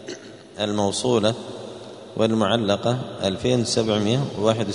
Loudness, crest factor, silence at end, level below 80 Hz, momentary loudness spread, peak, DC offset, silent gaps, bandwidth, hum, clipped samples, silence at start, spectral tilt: -22 LUFS; 20 dB; 0 s; -56 dBFS; 16 LU; -4 dBFS; under 0.1%; none; 11 kHz; none; under 0.1%; 0 s; -5 dB/octave